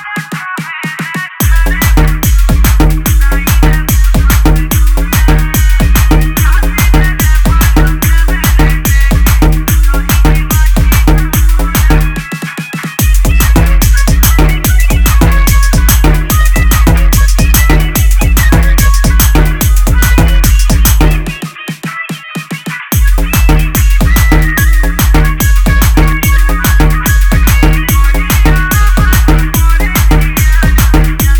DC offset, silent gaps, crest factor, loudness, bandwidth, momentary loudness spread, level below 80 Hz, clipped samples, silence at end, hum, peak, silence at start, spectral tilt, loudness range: under 0.1%; none; 6 dB; -9 LUFS; 19.5 kHz; 7 LU; -8 dBFS; 0.3%; 0 s; none; 0 dBFS; 0 s; -4.5 dB/octave; 2 LU